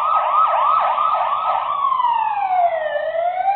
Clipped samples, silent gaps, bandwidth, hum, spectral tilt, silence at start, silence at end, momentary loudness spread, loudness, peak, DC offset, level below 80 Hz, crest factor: under 0.1%; none; 4.4 kHz; none; -6 dB/octave; 0 s; 0 s; 5 LU; -18 LUFS; -6 dBFS; under 0.1%; -64 dBFS; 12 dB